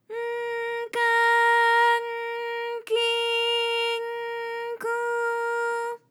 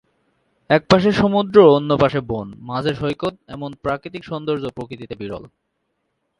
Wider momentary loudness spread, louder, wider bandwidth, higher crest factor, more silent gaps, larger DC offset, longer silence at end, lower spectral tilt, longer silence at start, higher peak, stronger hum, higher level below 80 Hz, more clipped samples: second, 12 LU vs 19 LU; second, -24 LUFS vs -18 LUFS; first, 17 kHz vs 10 kHz; second, 14 dB vs 20 dB; neither; neither; second, 0.15 s vs 0.95 s; second, 0.5 dB/octave vs -7 dB/octave; second, 0.1 s vs 0.7 s; second, -12 dBFS vs 0 dBFS; neither; second, under -90 dBFS vs -48 dBFS; neither